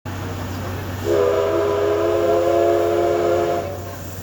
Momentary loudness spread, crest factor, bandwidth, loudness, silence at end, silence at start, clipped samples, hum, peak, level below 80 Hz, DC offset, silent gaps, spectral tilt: 11 LU; 14 dB; over 20 kHz; -20 LUFS; 0 s; 0.05 s; under 0.1%; none; -6 dBFS; -46 dBFS; under 0.1%; none; -6 dB/octave